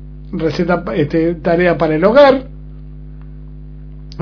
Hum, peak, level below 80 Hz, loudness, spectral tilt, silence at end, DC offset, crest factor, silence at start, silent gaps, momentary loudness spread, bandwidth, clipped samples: 50 Hz at -30 dBFS; 0 dBFS; -34 dBFS; -13 LUFS; -8 dB/octave; 0 s; under 0.1%; 16 dB; 0 s; none; 26 LU; 5.4 kHz; 0.3%